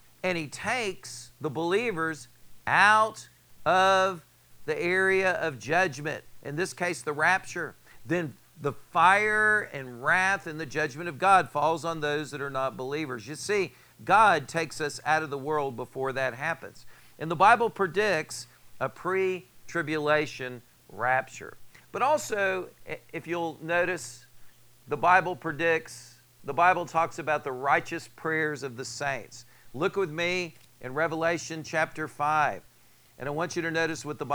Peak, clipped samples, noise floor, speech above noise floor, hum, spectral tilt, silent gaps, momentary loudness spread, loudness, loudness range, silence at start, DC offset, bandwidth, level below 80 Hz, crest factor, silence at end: -6 dBFS; under 0.1%; -60 dBFS; 32 dB; none; -4 dB/octave; none; 16 LU; -27 LUFS; 5 LU; 0.25 s; under 0.1%; over 20 kHz; -66 dBFS; 22 dB; 0 s